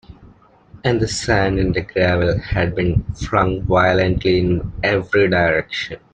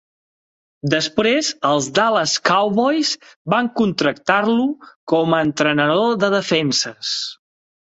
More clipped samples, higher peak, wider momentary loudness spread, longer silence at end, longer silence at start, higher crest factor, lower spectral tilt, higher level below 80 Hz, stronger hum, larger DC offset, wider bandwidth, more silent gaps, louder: neither; second, -4 dBFS vs 0 dBFS; about the same, 6 LU vs 6 LU; second, 0.15 s vs 0.6 s; second, 0.1 s vs 0.85 s; about the same, 14 dB vs 18 dB; first, -6 dB/octave vs -4 dB/octave; first, -34 dBFS vs -60 dBFS; neither; neither; first, 9.4 kHz vs 8.2 kHz; second, none vs 3.36-3.45 s, 4.96-5.07 s; about the same, -18 LUFS vs -18 LUFS